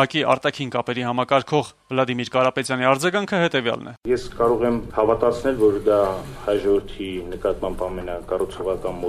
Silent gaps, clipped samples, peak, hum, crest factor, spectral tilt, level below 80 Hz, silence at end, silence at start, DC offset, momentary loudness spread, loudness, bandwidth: none; under 0.1%; -2 dBFS; none; 20 dB; -5.5 dB/octave; -42 dBFS; 0 s; 0 s; under 0.1%; 8 LU; -22 LUFS; 14 kHz